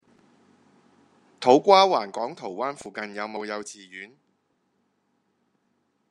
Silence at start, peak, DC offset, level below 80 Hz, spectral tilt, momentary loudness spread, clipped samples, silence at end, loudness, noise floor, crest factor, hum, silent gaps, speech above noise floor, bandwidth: 1.4 s; -2 dBFS; under 0.1%; -78 dBFS; -4 dB/octave; 24 LU; under 0.1%; 2.05 s; -23 LUFS; -72 dBFS; 24 dB; none; none; 49 dB; 11 kHz